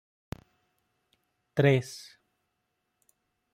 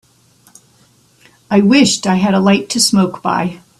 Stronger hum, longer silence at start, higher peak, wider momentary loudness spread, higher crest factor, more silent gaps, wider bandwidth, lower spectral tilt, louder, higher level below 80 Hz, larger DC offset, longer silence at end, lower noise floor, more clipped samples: neither; about the same, 1.55 s vs 1.5 s; second, -10 dBFS vs 0 dBFS; first, 22 LU vs 7 LU; first, 24 dB vs 14 dB; neither; about the same, 14.5 kHz vs 13.5 kHz; first, -6.5 dB/octave vs -4.5 dB/octave; second, -26 LUFS vs -13 LUFS; second, -64 dBFS vs -52 dBFS; neither; first, 1.5 s vs 0.25 s; first, -80 dBFS vs -51 dBFS; neither